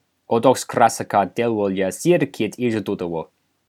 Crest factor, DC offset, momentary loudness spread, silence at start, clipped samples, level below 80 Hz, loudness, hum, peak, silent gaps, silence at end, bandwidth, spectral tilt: 20 dB; under 0.1%; 9 LU; 0.3 s; under 0.1%; -64 dBFS; -20 LUFS; none; 0 dBFS; none; 0.45 s; 16.5 kHz; -5.5 dB/octave